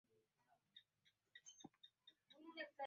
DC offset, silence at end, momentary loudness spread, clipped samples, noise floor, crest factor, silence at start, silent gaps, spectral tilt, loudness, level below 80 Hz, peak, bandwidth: under 0.1%; 0 s; 14 LU; under 0.1%; -84 dBFS; 24 dB; 0.1 s; none; -0.5 dB/octave; -62 LUFS; under -90 dBFS; -38 dBFS; 7 kHz